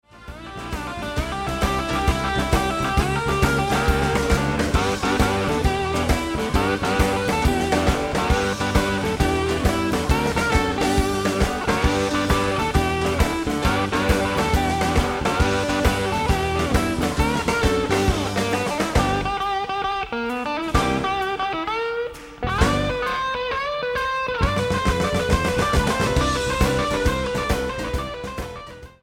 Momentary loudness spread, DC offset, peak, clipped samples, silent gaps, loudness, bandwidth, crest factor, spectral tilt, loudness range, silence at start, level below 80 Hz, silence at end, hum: 6 LU; under 0.1%; -2 dBFS; under 0.1%; none; -22 LUFS; 16.5 kHz; 18 dB; -5 dB/octave; 2 LU; 0.15 s; -28 dBFS; 0.15 s; none